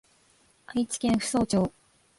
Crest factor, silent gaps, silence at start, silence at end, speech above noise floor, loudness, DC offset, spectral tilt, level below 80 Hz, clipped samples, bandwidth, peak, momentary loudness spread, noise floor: 16 dB; none; 0.7 s; 0.5 s; 37 dB; -27 LUFS; under 0.1%; -5 dB/octave; -54 dBFS; under 0.1%; 11.5 kHz; -14 dBFS; 7 LU; -63 dBFS